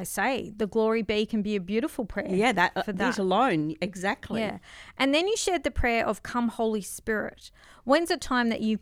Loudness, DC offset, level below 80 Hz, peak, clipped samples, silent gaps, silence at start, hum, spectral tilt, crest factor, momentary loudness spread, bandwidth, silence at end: -27 LUFS; under 0.1%; -46 dBFS; -8 dBFS; under 0.1%; none; 0 s; none; -4.5 dB/octave; 20 dB; 8 LU; 16 kHz; 0.05 s